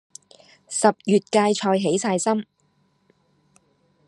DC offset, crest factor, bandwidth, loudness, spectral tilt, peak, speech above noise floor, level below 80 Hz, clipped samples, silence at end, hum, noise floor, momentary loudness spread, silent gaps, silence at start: under 0.1%; 22 dB; 11.5 kHz; -21 LUFS; -4.5 dB/octave; -2 dBFS; 45 dB; -74 dBFS; under 0.1%; 1.65 s; none; -65 dBFS; 9 LU; none; 0.7 s